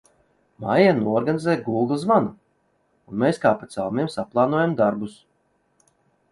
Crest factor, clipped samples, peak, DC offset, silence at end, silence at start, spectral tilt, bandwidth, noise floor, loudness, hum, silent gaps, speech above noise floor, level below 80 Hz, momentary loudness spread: 20 dB; under 0.1%; -4 dBFS; under 0.1%; 1.2 s; 0.6 s; -7 dB/octave; 11.5 kHz; -67 dBFS; -22 LUFS; none; none; 46 dB; -62 dBFS; 12 LU